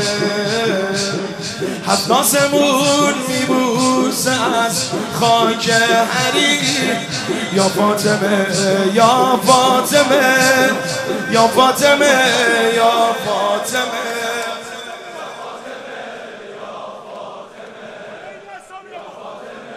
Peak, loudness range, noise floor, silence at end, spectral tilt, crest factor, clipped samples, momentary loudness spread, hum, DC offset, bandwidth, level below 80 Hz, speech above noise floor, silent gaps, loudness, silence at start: 0 dBFS; 18 LU; -35 dBFS; 0 s; -3 dB/octave; 16 dB; under 0.1%; 21 LU; none; under 0.1%; 15 kHz; -58 dBFS; 21 dB; none; -14 LUFS; 0 s